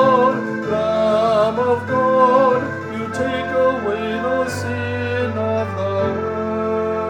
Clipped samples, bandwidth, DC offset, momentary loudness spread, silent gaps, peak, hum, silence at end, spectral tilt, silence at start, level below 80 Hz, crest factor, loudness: under 0.1%; 15 kHz; under 0.1%; 8 LU; none; -2 dBFS; none; 0 s; -6.5 dB/octave; 0 s; -56 dBFS; 16 dB; -19 LUFS